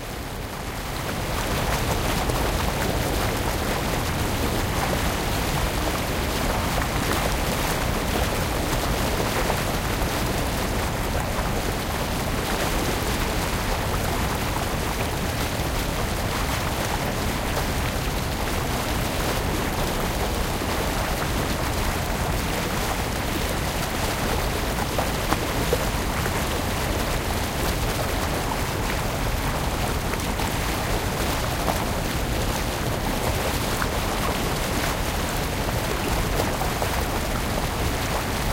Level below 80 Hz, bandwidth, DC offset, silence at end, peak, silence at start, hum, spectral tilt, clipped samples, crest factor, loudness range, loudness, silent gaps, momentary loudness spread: -30 dBFS; 17 kHz; under 0.1%; 0 s; 0 dBFS; 0 s; none; -4 dB/octave; under 0.1%; 24 dB; 1 LU; -25 LUFS; none; 2 LU